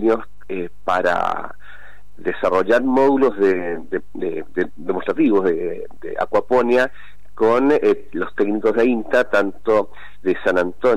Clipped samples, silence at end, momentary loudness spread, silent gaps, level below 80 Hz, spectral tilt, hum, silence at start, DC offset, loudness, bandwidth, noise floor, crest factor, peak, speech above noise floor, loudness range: under 0.1%; 0 s; 12 LU; none; -50 dBFS; -6.5 dB/octave; none; 0 s; 4%; -19 LUFS; 11.5 kHz; -44 dBFS; 12 dB; -8 dBFS; 26 dB; 2 LU